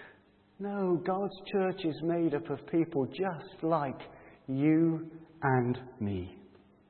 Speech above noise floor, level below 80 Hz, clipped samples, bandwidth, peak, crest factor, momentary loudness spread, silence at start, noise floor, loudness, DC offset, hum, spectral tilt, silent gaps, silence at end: 31 dB; -70 dBFS; under 0.1%; 4.4 kHz; -14 dBFS; 18 dB; 12 LU; 0 s; -62 dBFS; -32 LUFS; under 0.1%; none; -11.5 dB/octave; none; 0.45 s